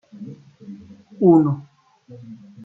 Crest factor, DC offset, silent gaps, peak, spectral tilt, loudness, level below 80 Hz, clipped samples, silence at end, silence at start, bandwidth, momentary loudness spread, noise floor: 18 dB; under 0.1%; none; -4 dBFS; -12 dB/octave; -17 LUFS; -66 dBFS; under 0.1%; 0.3 s; 0.2 s; 1.6 kHz; 27 LU; -42 dBFS